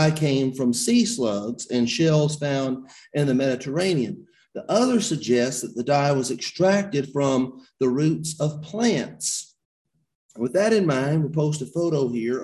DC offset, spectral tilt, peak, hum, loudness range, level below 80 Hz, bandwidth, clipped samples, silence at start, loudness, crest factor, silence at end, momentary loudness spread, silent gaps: under 0.1%; -5 dB/octave; -6 dBFS; none; 2 LU; -60 dBFS; 12.5 kHz; under 0.1%; 0 s; -23 LUFS; 16 dB; 0 s; 8 LU; 9.65-9.85 s, 10.15-10.29 s